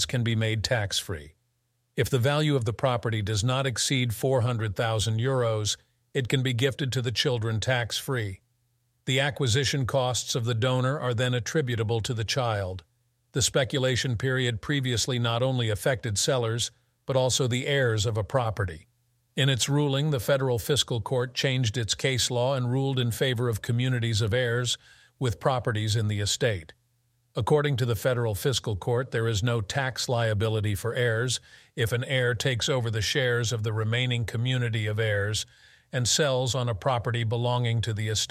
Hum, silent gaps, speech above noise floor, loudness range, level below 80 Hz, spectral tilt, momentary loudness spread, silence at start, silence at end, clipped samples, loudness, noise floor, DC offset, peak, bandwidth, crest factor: none; none; 48 dB; 1 LU; -54 dBFS; -4.5 dB/octave; 5 LU; 0 s; 0.05 s; under 0.1%; -26 LUFS; -74 dBFS; under 0.1%; -8 dBFS; 15.5 kHz; 18 dB